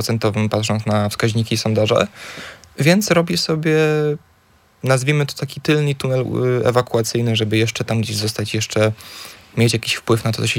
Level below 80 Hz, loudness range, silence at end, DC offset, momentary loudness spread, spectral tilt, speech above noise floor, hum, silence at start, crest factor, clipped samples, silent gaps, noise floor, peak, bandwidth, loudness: -54 dBFS; 2 LU; 0 s; under 0.1%; 8 LU; -5 dB/octave; 37 dB; none; 0 s; 18 dB; under 0.1%; none; -54 dBFS; -2 dBFS; 17 kHz; -18 LUFS